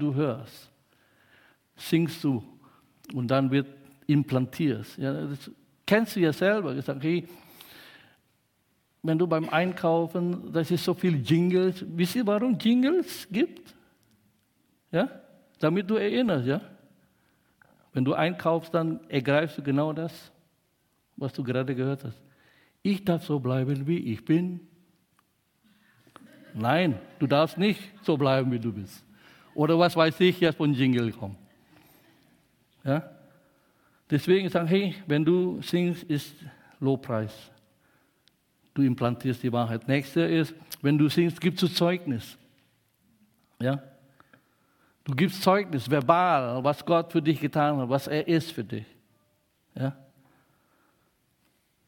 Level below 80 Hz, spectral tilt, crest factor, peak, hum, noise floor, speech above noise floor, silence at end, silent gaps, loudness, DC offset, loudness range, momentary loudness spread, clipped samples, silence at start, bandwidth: -68 dBFS; -7 dB/octave; 24 dB; -4 dBFS; none; -71 dBFS; 45 dB; 1.95 s; none; -27 LUFS; under 0.1%; 6 LU; 13 LU; under 0.1%; 0 s; 17 kHz